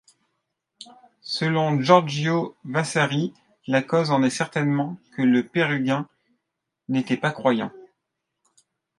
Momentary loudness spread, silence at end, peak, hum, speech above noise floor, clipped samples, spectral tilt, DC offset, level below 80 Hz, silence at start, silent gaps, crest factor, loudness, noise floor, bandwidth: 12 LU; 1.15 s; 0 dBFS; none; 59 dB; under 0.1%; -6 dB/octave; under 0.1%; -70 dBFS; 0.8 s; none; 24 dB; -23 LUFS; -82 dBFS; 11.5 kHz